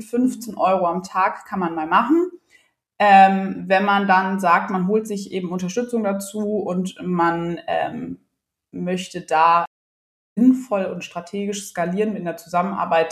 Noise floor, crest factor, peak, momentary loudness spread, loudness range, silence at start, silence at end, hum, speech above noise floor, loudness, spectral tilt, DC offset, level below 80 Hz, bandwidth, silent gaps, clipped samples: -72 dBFS; 18 dB; -2 dBFS; 12 LU; 6 LU; 0 s; 0 s; none; 53 dB; -20 LUFS; -5.5 dB/octave; under 0.1%; -64 dBFS; 14.5 kHz; 9.67-10.36 s; under 0.1%